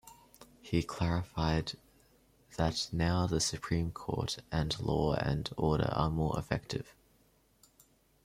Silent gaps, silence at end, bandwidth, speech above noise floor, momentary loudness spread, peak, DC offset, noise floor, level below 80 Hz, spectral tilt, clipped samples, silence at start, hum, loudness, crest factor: none; 1.35 s; 15.5 kHz; 36 dB; 10 LU; -14 dBFS; under 0.1%; -68 dBFS; -50 dBFS; -5.5 dB/octave; under 0.1%; 0.05 s; none; -34 LUFS; 20 dB